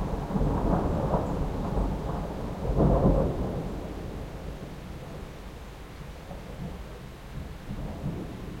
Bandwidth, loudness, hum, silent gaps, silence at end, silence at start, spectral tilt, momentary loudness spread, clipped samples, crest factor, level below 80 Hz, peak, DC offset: 16 kHz; -31 LUFS; none; none; 0 s; 0 s; -8.5 dB/octave; 18 LU; under 0.1%; 20 dB; -36 dBFS; -10 dBFS; under 0.1%